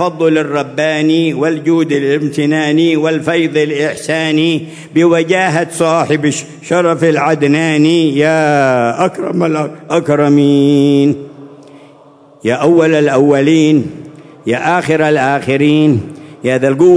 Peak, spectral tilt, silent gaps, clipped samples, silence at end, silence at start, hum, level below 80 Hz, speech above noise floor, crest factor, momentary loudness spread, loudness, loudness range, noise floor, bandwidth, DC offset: 0 dBFS; -6 dB/octave; none; under 0.1%; 0 s; 0 s; none; -58 dBFS; 31 dB; 12 dB; 7 LU; -12 LUFS; 2 LU; -42 dBFS; 11 kHz; under 0.1%